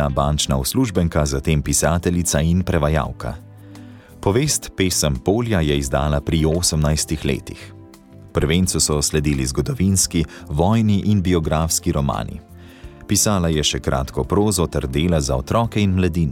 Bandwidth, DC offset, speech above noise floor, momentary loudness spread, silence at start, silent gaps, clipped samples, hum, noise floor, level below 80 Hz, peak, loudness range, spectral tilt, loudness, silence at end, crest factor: 17.5 kHz; under 0.1%; 24 dB; 7 LU; 0 s; none; under 0.1%; none; -43 dBFS; -30 dBFS; -4 dBFS; 2 LU; -4.5 dB/octave; -19 LUFS; 0 s; 14 dB